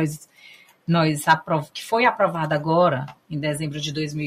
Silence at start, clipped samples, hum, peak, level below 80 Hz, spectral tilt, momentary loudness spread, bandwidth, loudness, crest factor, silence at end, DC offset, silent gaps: 0 s; under 0.1%; none; -4 dBFS; -60 dBFS; -5.5 dB/octave; 10 LU; 15.5 kHz; -22 LUFS; 18 dB; 0 s; under 0.1%; none